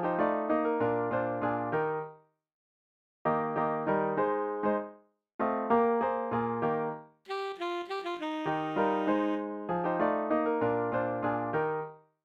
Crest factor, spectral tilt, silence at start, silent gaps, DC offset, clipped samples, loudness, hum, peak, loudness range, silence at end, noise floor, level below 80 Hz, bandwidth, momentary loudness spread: 16 dB; -8 dB/octave; 0 s; 2.54-3.25 s, 5.34-5.39 s; under 0.1%; under 0.1%; -31 LUFS; none; -16 dBFS; 2 LU; 0.25 s; -53 dBFS; -68 dBFS; 7.8 kHz; 8 LU